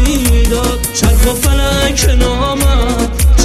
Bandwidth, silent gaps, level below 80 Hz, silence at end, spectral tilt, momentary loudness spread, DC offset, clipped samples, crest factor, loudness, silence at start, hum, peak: 15.5 kHz; none; -12 dBFS; 0 s; -4.5 dB/octave; 2 LU; under 0.1%; under 0.1%; 10 dB; -12 LUFS; 0 s; none; 0 dBFS